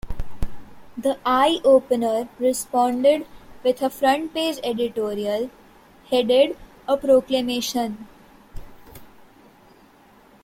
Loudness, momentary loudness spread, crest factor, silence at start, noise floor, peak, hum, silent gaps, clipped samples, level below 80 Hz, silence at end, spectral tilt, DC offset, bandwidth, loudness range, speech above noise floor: -21 LUFS; 17 LU; 18 dB; 0.05 s; -52 dBFS; -4 dBFS; none; none; under 0.1%; -42 dBFS; 1.4 s; -4 dB/octave; under 0.1%; 16.5 kHz; 5 LU; 32 dB